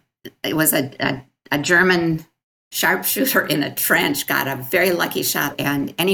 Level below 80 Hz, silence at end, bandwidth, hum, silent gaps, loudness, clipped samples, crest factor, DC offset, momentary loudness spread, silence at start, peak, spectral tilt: -56 dBFS; 0 s; 19.5 kHz; none; 2.43-2.71 s; -19 LUFS; under 0.1%; 16 dB; under 0.1%; 8 LU; 0.25 s; -4 dBFS; -3.5 dB/octave